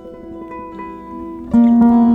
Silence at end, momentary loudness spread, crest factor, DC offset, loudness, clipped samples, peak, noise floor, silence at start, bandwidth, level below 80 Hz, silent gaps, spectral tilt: 0 s; 21 LU; 12 dB; under 0.1%; -12 LUFS; under 0.1%; -2 dBFS; -32 dBFS; 0.05 s; 3.5 kHz; -44 dBFS; none; -10 dB/octave